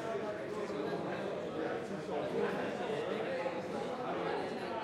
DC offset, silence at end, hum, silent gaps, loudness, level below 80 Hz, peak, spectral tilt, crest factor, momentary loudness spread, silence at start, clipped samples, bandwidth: under 0.1%; 0 s; none; none; -38 LUFS; -74 dBFS; -22 dBFS; -6 dB/octave; 16 dB; 4 LU; 0 s; under 0.1%; 13 kHz